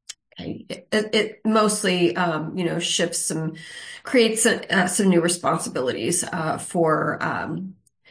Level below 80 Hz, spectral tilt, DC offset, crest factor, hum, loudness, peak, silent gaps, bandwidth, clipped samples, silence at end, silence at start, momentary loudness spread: -64 dBFS; -3.5 dB/octave; under 0.1%; 18 dB; none; -22 LUFS; -6 dBFS; none; 10.5 kHz; under 0.1%; 0.4 s; 0.1 s; 16 LU